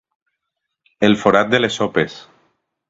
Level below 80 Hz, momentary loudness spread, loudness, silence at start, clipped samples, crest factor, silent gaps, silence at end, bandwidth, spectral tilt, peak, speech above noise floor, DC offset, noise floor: -54 dBFS; 7 LU; -16 LUFS; 1 s; under 0.1%; 20 dB; none; 0.7 s; 8 kHz; -5 dB/octave; 0 dBFS; 62 dB; under 0.1%; -78 dBFS